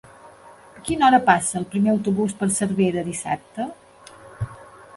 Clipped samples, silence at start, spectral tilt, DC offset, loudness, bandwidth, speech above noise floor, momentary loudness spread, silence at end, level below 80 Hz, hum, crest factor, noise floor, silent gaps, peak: under 0.1%; 0.25 s; -5 dB/octave; under 0.1%; -21 LUFS; 11.5 kHz; 26 dB; 17 LU; 0.3 s; -52 dBFS; none; 22 dB; -46 dBFS; none; 0 dBFS